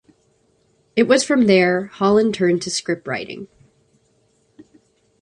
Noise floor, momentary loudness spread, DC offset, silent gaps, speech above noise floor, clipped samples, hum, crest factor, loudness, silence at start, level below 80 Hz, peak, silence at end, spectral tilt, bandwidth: -62 dBFS; 13 LU; under 0.1%; none; 44 dB; under 0.1%; none; 18 dB; -18 LUFS; 0.95 s; -60 dBFS; -2 dBFS; 1.75 s; -4.5 dB/octave; 11 kHz